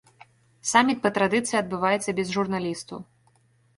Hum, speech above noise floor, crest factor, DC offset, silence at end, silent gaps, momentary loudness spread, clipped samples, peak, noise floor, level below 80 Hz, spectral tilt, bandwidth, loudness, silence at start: none; 39 dB; 22 dB; under 0.1%; 0.75 s; none; 13 LU; under 0.1%; -4 dBFS; -63 dBFS; -62 dBFS; -4 dB/octave; 11.5 kHz; -24 LUFS; 0.65 s